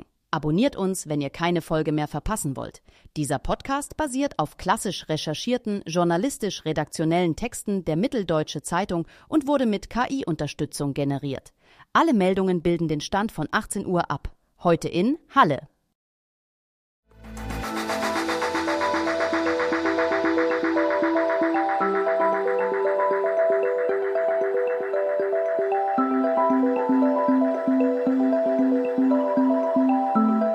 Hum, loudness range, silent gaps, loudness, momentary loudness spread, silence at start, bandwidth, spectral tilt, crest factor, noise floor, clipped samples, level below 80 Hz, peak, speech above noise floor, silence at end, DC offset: none; 6 LU; 15.95-17.03 s; -24 LUFS; 7 LU; 0 s; 15 kHz; -5.5 dB/octave; 18 dB; under -90 dBFS; under 0.1%; -48 dBFS; -4 dBFS; over 65 dB; 0 s; under 0.1%